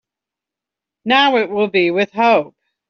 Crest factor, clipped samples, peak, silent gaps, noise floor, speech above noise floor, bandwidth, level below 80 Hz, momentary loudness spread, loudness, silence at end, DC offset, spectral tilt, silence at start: 16 dB; under 0.1%; -2 dBFS; none; -86 dBFS; 71 dB; 6.8 kHz; -64 dBFS; 8 LU; -15 LUFS; 0.4 s; under 0.1%; -1.5 dB/octave; 1.05 s